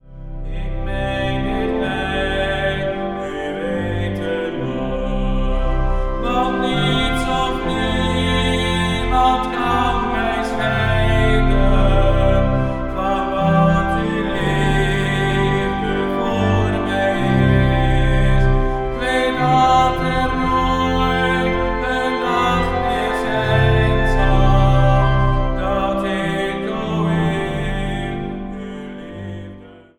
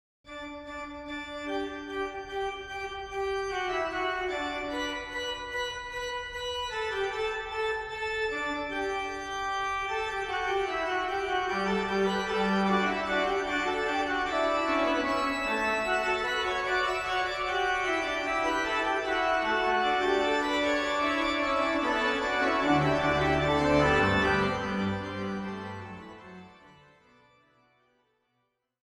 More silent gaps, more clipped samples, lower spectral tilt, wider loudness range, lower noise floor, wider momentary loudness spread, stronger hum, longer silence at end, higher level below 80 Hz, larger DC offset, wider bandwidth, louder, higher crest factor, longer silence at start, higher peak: neither; neither; first, -6.5 dB/octave vs -4.5 dB/octave; about the same, 5 LU vs 7 LU; second, -39 dBFS vs -78 dBFS; about the same, 8 LU vs 10 LU; neither; second, 0.25 s vs 2.1 s; first, -22 dBFS vs -50 dBFS; neither; second, 11.5 kHz vs 13 kHz; first, -18 LUFS vs -29 LUFS; about the same, 16 dB vs 18 dB; second, 0.05 s vs 0.25 s; first, -2 dBFS vs -12 dBFS